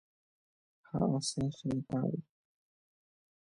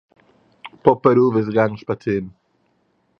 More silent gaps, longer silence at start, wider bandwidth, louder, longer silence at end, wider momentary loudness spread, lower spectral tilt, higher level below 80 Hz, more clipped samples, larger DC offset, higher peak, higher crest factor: neither; first, 0.95 s vs 0.65 s; first, 11 kHz vs 6.4 kHz; second, -35 LUFS vs -18 LUFS; first, 1.2 s vs 0.9 s; second, 8 LU vs 11 LU; second, -6 dB/octave vs -9.5 dB/octave; second, -64 dBFS vs -56 dBFS; neither; neither; second, -18 dBFS vs 0 dBFS; about the same, 20 dB vs 20 dB